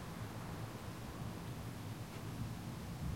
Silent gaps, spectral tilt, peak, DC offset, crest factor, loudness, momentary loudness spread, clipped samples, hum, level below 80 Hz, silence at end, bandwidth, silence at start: none; -6 dB/octave; -32 dBFS; under 0.1%; 14 dB; -47 LUFS; 2 LU; under 0.1%; none; -56 dBFS; 0 s; 16.5 kHz; 0 s